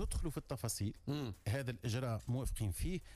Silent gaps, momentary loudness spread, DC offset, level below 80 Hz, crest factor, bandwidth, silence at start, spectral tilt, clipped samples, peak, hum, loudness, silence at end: none; 3 LU; under 0.1%; -46 dBFS; 12 dB; 15.5 kHz; 0 s; -5.5 dB/octave; under 0.1%; -28 dBFS; none; -41 LUFS; 0 s